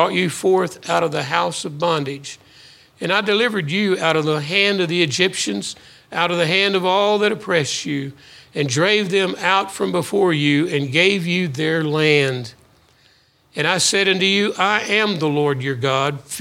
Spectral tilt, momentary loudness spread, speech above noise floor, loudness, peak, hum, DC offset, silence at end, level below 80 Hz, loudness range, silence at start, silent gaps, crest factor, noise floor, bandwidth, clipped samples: -4 dB/octave; 9 LU; 37 dB; -18 LUFS; 0 dBFS; none; under 0.1%; 0 s; -64 dBFS; 3 LU; 0 s; none; 18 dB; -56 dBFS; 16.5 kHz; under 0.1%